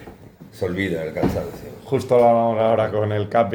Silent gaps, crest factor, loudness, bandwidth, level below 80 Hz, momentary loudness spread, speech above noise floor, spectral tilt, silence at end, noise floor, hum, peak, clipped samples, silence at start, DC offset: none; 16 dB; -20 LUFS; over 20 kHz; -46 dBFS; 13 LU; 23 dB; -7.5 dB/octave; 0 s; -43 dBFS; none; -4 dBFS; under 0.1%; 0 s; under 0.1%